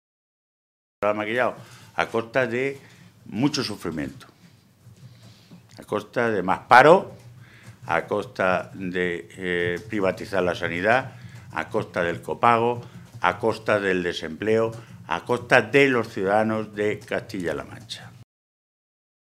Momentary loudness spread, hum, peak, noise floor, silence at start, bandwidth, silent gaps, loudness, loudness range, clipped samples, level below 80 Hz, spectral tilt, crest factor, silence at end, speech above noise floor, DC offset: 15 LU; none; 0 dBFS; -54 dBFS; 1 s; 15 kHz; none; -23 LUFS; 7 LU; under 0.1%; -60 dBFS; -5.5 dB/octave; 24 dB; 1 s; 31 dB; under 0.1%